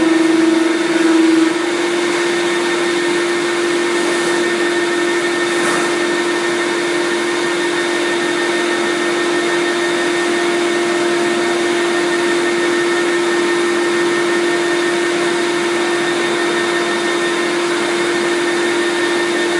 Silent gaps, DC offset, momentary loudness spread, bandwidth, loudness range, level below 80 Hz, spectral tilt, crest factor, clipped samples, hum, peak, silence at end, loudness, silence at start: none; under 0.1%; 2 LU; 11.5 kHz; 1 LU; -74 dBFS; -3 dB/octave; 12 dB; under 0.1%; none; -2 dBFS; 0 s; -15 LUFS; 0 s